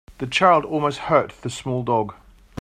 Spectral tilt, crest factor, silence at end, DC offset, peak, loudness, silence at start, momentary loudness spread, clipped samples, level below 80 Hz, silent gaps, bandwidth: -5.5 dB/octave; 18 dB; 0.45 s; under 0.1%; -2 dBFS; -21 LUFS; 0.1 s; 14 LU; under 0.1%; -52 dBFS; none; 14 kHz